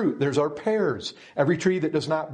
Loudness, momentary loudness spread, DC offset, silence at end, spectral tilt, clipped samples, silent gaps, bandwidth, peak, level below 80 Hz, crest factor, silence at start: -25 LUFS; 5 LU; under 0.1%; 0 s; -6 dB/octave; under 0.1%; none; 10 kHz; -8 dBFS; -66 dBFS; 18 dB; 0 s